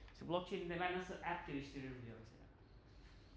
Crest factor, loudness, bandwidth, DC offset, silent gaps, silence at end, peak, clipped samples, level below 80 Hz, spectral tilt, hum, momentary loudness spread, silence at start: 22 dB; -45 LUFS; 8 kHz; under 0.1%; none; 0 s; -24 dBFS; under 0.1%; -64 dBFS; -6 dB/octave; none; 22 LU; 0 s